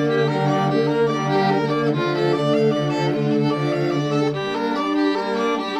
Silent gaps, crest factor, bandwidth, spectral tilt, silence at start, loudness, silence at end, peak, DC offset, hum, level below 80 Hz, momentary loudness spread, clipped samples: none; 12 dB; 10 kHz; -7 dB/octave; 0 s; -20 LUFS; 0 s; -8 dBFS; under 0.1%; none; -60 dBFS; 3 LU; under 0.1%